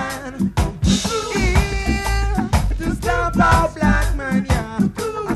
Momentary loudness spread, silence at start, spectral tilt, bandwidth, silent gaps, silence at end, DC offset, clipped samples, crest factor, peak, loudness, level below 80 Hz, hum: 7 LU; 0 s; -5.5 dB/octave; 13.5 kHz; none; 0 s; under 0.1%; under 0.1%; 18 dB; 0 dBFS; -19 LUFS; -24 dBFS; none